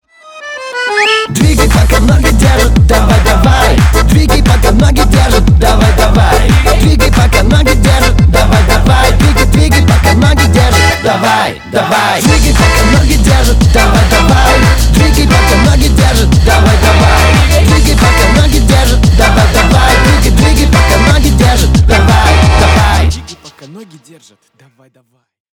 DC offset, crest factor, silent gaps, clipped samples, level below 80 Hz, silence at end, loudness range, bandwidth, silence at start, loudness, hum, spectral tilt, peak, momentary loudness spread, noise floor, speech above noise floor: under 0.1%; 6 dB; none; under 0.1%; -10 dBFS; 1.7 s; 1 LU; 20 kHz; 0.35 s; -7 LUFS; none; -5 dB/octave; 0 dBFS; 2 LU; -32 dBFS; 25 dB